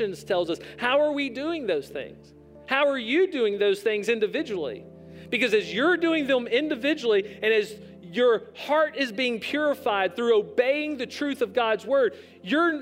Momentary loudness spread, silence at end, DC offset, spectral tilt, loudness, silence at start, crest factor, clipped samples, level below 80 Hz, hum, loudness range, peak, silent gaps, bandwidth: 8 LU; 0 s; under 0.1%; -4.5 dB/octave; -25 LUFS; 0 s; 18 dB; under 0.1%; -68 dBFS; none; 2 LU; -8 dBFS; none; 16 kHz